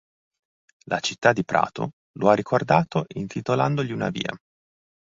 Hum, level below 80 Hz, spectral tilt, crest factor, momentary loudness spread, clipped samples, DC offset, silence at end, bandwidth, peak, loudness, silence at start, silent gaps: none; -60 dBFS; -5.5 dB/octave; 22 dB; 10 LU; under 0.1%; under 0.1%; 0.75 s; 7.8 kHz; -2 dBFS; -24 LUFS; 0.85 s; 1.93-2.14 s